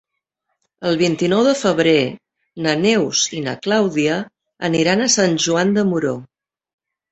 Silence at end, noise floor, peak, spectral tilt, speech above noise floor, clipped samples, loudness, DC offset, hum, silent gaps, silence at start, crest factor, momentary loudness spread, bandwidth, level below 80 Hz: 0.85 s; -75 dBFS; -2 dBFS; -4 dB/octave; 58 dB; under 0.1%; -17 LUFS; under 0.1%; none; none; 0.8 s; 16 dB; 10 LU; 8.2 kHz; -58 dBFS